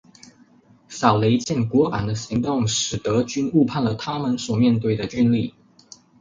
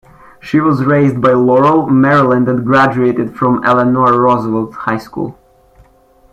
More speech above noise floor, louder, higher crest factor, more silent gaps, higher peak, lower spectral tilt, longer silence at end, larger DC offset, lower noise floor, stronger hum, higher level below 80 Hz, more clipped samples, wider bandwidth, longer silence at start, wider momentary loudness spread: second, 33 dB vs 37 dB; second, -21 LUFS vs -11 LUFS; first, 20 dB vs 12 dB; neither; about the same, -2 dBFS vs 0 dBFS; second, -5.5 dB/octave vs -8.5 dB/octave; second, 0.7 s vs 1 s; neither; first, -53 dBFS vs -48 dBFS; neither; about the same, -50 dBFS vs -46 dBFS; neither; first, 9.4 kHz vs 8.2 kHz; first, 0.9 s vs 0.45 s; second, 6 LU vs 9 LU